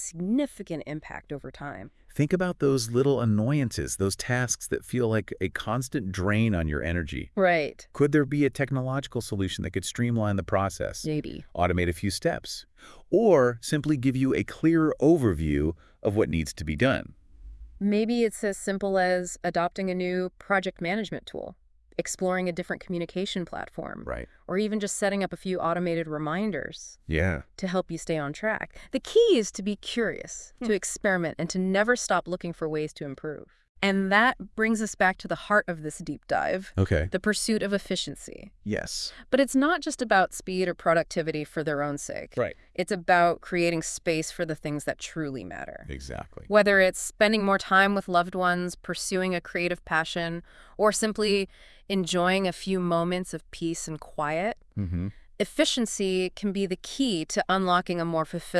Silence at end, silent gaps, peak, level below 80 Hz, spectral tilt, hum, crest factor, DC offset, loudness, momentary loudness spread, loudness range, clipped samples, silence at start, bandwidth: 0 s; 33.69-33.75 s; -6 dBFS; -50 dBFS; -5 dB/octave; none; 20 dB; under 0.1%; -27 LUFS; 13 LU; 5 LU; under 0.1%; 0 s; 12 kHz